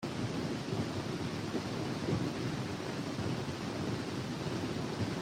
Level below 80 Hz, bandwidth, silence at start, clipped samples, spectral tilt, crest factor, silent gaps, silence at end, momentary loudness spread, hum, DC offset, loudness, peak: -60 dBFS; 16 kHz; 0 s; under 0.1%; -6 dB/octave; 16 dB; none; 0 s; 3 LU; none; under 0.1%; -37 LUFS; -22 dBFS